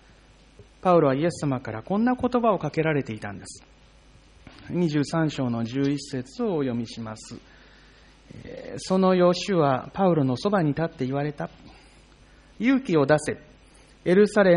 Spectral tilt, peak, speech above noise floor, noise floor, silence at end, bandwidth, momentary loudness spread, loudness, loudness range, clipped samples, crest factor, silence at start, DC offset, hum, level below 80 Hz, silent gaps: -6.5 dB/octave; -8 dBFS; 30 dB; -53 dBFS; 0 s; 10.5 kHz; 17 LU; -24 LUFS; 5 LU; under 0.1%; 18 dB; 0.6 s; under 0.1%; none; -54 dBFS; none